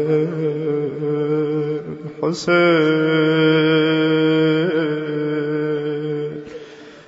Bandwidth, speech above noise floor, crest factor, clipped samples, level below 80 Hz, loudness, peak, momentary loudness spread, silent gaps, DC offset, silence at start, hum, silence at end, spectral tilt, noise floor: 8 kHz; 22 dB; 14 dB; under 0.1%; -66 dBFS; -18 LUFS; -4 dBFS; 12 LU; none; under 0.1%; 0 s; none; 0.05 s; -7 dB/octave; -38 dBFS